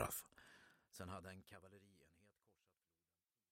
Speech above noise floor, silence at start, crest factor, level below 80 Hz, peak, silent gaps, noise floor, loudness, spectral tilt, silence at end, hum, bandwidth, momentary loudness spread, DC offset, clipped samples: over 33 dB; 0 s; 32 dB; -76 dBFS; -24 dBFS; none; under -90 dBFS; -54 LUFS; -4 dB/octave; 1.2 s; none; 16 kHz; 17 LU; under 0.1%; under 0.1%